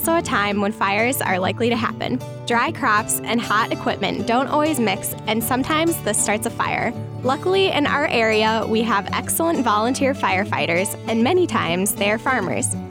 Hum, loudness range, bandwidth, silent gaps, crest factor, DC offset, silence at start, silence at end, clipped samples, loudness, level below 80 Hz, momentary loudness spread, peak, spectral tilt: none; 2 LU; 19.5 kHz; none; 12 dB; under 0.1%; 0 s; 0 s; under 0.1%; -20 LUFS; -52 dBFS; 5 LU; -8 dBFS; -4 dB/octave